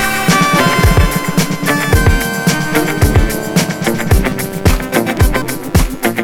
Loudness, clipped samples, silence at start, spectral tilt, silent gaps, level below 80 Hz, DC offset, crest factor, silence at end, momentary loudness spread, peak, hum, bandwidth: -13 LUFS; under 0.1%; 0 s; -5 dB/octave; none; -18 dBFS; under 0.1%; 12 dB; 0 s; 5 LU; 0 dBFS; none; 19.5 kHz